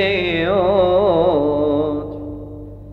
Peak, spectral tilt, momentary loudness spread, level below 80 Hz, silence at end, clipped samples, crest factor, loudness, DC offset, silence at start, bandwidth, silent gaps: -4 dBFS; -8 dB/octave; 17 LU; -40 dBFS; 0 s; under 0.1%; 14 dB; -17 LUFS; under 0.1%; 0 s; 5.4 kHz; none